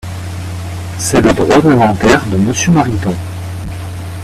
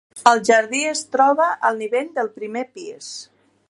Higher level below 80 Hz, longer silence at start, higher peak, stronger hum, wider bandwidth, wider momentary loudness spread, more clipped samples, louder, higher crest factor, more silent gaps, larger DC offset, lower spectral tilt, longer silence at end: first, -32 dBFS vs -72 dBFS; about the same, 0.05 s vs 0.15 s; about the same, 0 dBFS vs 0 dBFS; neither; first, 15 kHz vs 11.5 kHz; second, 14 LU vs 17 LU; neither; first, -12 LUFS vs -19 LUFS; second, 12 dB vs 20 dB; neither; neither; first, -5.5 dB/octave vs -2 dB/octave; second, 0 s vs 0.45 s